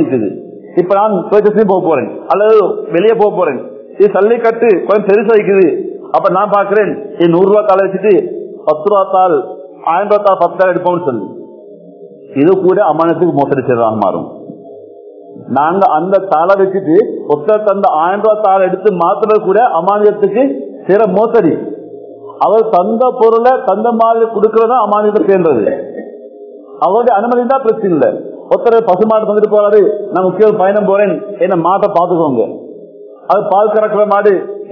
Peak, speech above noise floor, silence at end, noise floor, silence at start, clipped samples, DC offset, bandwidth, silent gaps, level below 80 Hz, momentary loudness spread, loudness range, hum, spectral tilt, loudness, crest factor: 0 dBFS; 24 dB; 0 s; -34 dBFS; 0 s; 0.5%; under 0.1%; 6 kHz; none; -60 dBFS; 9 LU; 3 LU; none; -9.5 dB/octave; -11 LUFS; 10 dB